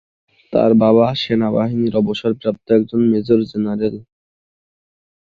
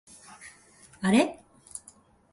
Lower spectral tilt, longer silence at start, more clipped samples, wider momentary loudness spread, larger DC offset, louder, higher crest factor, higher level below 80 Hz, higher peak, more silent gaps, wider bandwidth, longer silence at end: first, -8.5 dB/octave vs -5 dB/octave; about the same, 0.5 s vs 0.4 s; neither; second, 9 LU vs 25 LU; neither; first, -16 LUFS vs -26 LUFS; second, 16 dB vs 22 dB; first, -54 dBFS vs -66 dBFS; first, -2 dBFS vs -10 dBFS; neither; second, 6.4 kHz vs 11.5 kHz; first, 1.3 s vs 0.55 s